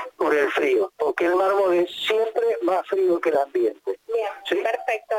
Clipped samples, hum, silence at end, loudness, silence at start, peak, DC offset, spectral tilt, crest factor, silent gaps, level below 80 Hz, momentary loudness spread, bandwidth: under 0.1%; none; 0 s; -22 LUFS; 0 s; -8 dBFS; under 0.1%; -4 dB/octave; 14 dB; none; -70 dBFS; 6 LU; 16 kHz